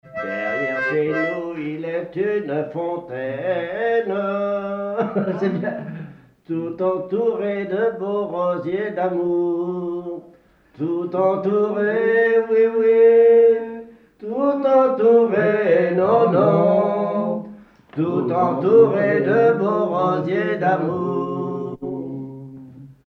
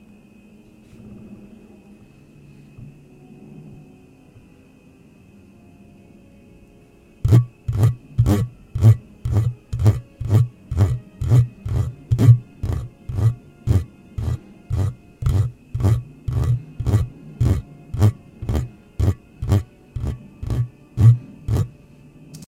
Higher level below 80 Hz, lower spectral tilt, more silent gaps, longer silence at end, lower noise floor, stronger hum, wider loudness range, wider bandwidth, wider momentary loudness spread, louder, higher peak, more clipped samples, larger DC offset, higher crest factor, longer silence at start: second, -62 dBFS vs -34 dBFS; about the same, -9 dB/octave vs -8.5 dB/octave; neither; about the same, 0.15 s vs 0.05 s; about the same, -52 dBFS vs -49 dBFS; neither; about the same, 7 LU vs 5 LU; second, 5.6 kHz vs 13 kHz; second, 14 LU vs 18 LU; about the same, -19 LUFS vs -21 LUFS; about the same, -4 dBFS vs -2 dBFS; neither; neither; about the same, 16 dB vs 20 dB; second, 0.05 s vs 1.05 s